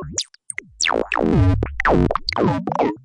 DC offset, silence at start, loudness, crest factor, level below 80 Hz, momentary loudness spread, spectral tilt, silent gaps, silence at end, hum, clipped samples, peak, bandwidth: under 0.1%; 0 s; -19 LUFS; 14 dB; -32 dBFS; 10 LU; -5 dB/octave; none; 0.05 s; none; under 0.1%; -4 dBFS; 11.5 kHz